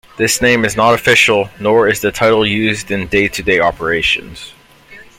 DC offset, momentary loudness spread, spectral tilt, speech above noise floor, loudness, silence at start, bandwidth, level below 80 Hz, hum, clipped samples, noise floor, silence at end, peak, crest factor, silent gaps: under 0.1%; 7 LU; -3.5 dB/octave; 27 dB; -12 LUFS; 0.2 s; 16.5 kHz; -40 dBFS; none; under 0.1%; -40 dBFS; 0.15 s; 0 dBFS; 14 dB; none